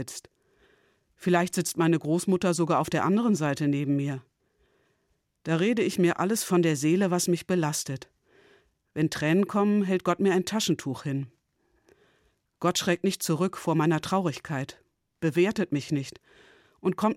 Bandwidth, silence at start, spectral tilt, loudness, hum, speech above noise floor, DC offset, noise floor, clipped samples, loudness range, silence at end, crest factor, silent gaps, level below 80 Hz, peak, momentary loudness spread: 16 kHz; 0 s; -5.5 dB/octave; -26 LUFS; none; 48 dB; under 0.1%; -74 dBFS; under 0.1%; 3 LU; 0 s; 16 dB; none; -68 dBFS; -10 dBFS; 9 LU